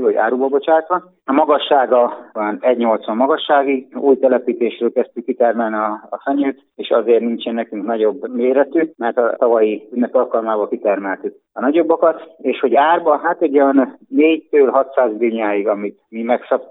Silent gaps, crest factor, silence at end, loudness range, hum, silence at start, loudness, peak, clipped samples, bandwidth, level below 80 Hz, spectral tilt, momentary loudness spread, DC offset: none; 16 dB; 0.05 s; 3 LU; none; 0 s; -16 LUFS; 0 dBFS; under 0.1%; 4 kHz; -78 dBFS; -9 dB/octave; 8 LU; under 0.1%